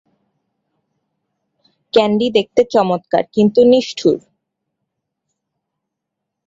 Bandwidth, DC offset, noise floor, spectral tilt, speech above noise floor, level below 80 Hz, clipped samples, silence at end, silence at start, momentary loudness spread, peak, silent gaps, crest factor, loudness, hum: 7.8 kHz; under 0.1%; -79 dBFS; -6 dB/octave; 66 dB; -58 dBFS; under 0.1%; 2.3 s; 1.95 s; 6 LU; 0 dBFS; none; 18 dB; -15 LUFS; none